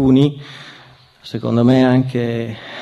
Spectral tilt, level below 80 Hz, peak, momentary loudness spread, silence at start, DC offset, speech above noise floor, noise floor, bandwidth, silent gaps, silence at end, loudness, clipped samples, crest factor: -8.5 dB/octave; -46 dBFS; -2 dBFS; 20 LU; 0 s; under 0.1%; 30 dB; -45 dBFS; 7.8 kHz; none; 0 s; -16 LUFS; under 0.1%; 14 dB